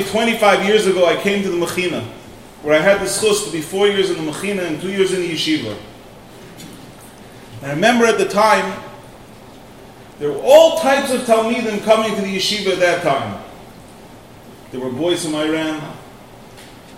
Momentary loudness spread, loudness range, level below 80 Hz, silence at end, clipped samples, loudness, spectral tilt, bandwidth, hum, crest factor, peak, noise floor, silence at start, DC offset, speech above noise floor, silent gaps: 20 LU; 7 LU; -50 dBFS; 0 s; under 0.1%; -16 LUFS; -4 dB/octave; 16 kHz; none; 18 dB; 0 dBFS; -40 dBFS; 0 s; 0.2%; 24 dB; none